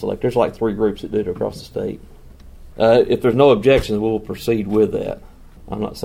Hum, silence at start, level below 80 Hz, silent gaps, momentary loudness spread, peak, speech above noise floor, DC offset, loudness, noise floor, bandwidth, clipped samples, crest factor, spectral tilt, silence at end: none; 0 s; -40 dBFS; none; 14 LU; 0 dBFS; 22 dB; under 0.1%; -18 LUFS; -40 dBFS; 16 kHz; under 0.1%; 18 dB; -7 dB/octave; 0 s